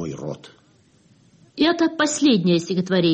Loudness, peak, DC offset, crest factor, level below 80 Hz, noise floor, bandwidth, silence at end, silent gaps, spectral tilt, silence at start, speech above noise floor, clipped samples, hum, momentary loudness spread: -20 LUFS; -8 dBFS; under 0.1%; 14 dB; -60 dBFS; -57 dBFS; 8.8 kHz; 0 s; none; -5 dB/octave; 0 s; 37 dB; under 0.1%; none; 17 LU